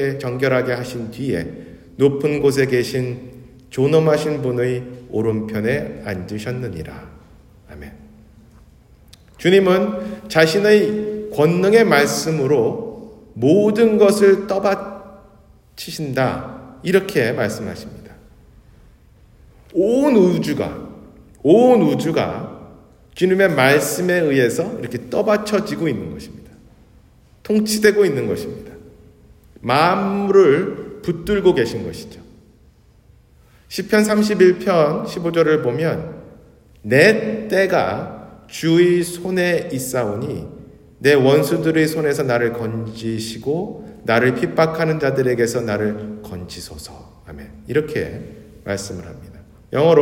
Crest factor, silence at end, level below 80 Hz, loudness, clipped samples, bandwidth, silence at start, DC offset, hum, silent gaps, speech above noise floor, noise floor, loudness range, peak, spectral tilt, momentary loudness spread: 18 dB; 0 s; -50 dBFS; -18 LUFS; under 0.1%; 16.5 kHz; 0 s; under 0.1%; none; none; 34 dB; -51 dBFS; 7 LU; 0 dBFS; -5.5 dB/octave; 20 LU